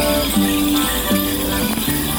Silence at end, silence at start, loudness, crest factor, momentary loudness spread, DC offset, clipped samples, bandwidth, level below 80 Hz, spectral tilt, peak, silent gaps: 0 s; 0 s; -17 LUFS; 14 dB; 2 LU; under 0.1%; under 0.1%; 19.5 kHz; -30 dBFS; -3.5 dB/octave; -4 dBFS; none